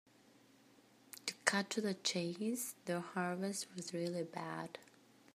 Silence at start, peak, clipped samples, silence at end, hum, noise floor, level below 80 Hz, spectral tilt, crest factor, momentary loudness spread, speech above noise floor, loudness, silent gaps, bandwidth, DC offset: 1.15 s; -12 dBFS; under 0.1%; 0.5 s; none; -67 dBFS; -90 dBFS; -3.5 dB/octave; 30 dB; 10 LU; 26 dB; -40 LUFS; none; 15.5 kHz; under 0.1%